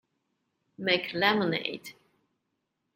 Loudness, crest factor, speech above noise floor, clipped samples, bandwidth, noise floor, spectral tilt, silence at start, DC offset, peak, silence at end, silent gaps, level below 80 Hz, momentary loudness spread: -28 LUFS; 24 dB; 52 dB; under 0.1%; 16 kHz; -81 dBFS; -5 dB/octave; 0.8 s; under 0.1%; -8 dBFS; 1.05 s; none; -74 dBFS; 16 LU